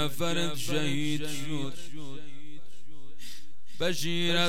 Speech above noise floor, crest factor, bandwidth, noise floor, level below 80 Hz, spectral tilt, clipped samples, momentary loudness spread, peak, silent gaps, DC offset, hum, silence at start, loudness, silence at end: 25 dB; 18 dB; 17.5 kHz; -56 dBFS; -66 dBFS; -4 dB/octave; under 0.1%; 20 LU; -14 dBFS; none; 5%; none; 0 s; -31 LUFS; 0 s